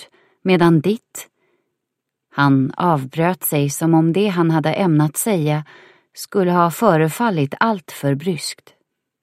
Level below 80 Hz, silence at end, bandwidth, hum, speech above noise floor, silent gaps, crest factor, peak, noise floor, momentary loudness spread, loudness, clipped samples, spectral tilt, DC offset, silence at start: -62 dBFS; 0.7 s; 16 kHz; none; 62 dB; none; 18 dB; 0 dBFS; -79 dBFS; 11 LU; -18 LUFS; under 0.1%; -6 dB/octave; under 0.1%; 0 s